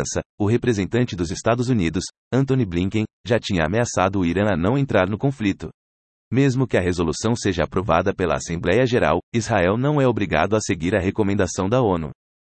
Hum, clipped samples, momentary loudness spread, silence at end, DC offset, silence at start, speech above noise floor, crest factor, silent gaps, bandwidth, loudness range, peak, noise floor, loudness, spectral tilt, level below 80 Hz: none; under 0.1%; 5 LU; 0.3 s; under 0.1%; 0 s; over 70 dB; 16 dB; 0.26-0.38 s, 2.18-2.31 s, 3.13-3.24 s, 5.74-6.31 s, 9.23-9.32 s; 8.8 kHz; 2 LU; -4 dBFS; under -90 dBFS; -21 LUFS; -6 dB/octave; -46 dBFS